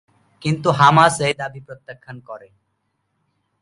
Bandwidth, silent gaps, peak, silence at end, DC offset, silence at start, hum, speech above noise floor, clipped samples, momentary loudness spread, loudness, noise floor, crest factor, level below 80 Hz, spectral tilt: 11.5 kHz; none; 0 dBFS; 1.25 s; under 0.1%; 0.45 s; none; 53 dB; under 0.1%; 26 LU; -16 LUFS; -71 dBFS; 20 dB; -58 dBFS; -5 dB/octave